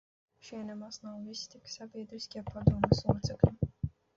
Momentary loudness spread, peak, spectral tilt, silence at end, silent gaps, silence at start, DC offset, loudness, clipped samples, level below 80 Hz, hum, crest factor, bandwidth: 15 LU; -10 dBFS; -7 dB/octave; 0.3 s; none; 0.45 s; under 0.1%; -33 LUFS; under 0.1%; -46 dBFS; none; 24 dB; 7.6 kHz